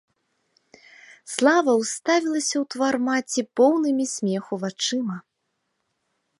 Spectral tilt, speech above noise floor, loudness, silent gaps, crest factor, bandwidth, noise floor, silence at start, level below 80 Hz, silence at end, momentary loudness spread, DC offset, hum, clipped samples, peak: -3.5 dB/octave; 54 dB; -23 LUFS; none; 20 dB; 11.5 kHz; -76 dBFS; 1.25 s; -78 dBFS; 1.2 s; 9 LU; under 0.1%; none; under 0.1%; -4 dBFS